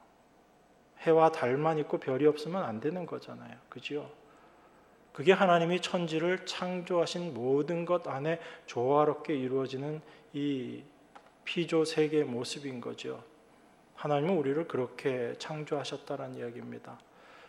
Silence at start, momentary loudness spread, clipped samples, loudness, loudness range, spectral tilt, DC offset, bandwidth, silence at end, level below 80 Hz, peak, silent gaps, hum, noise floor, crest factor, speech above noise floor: 0.95 s; 16 LU; under 0.1%; -31 LUFS; 5 LU; -6 dB/octave; under 0.1%; 12 kHz; 0 s; -78 dBFS; -10 dBFS; none; none; -63 dBFS; 22 dB; 32 dB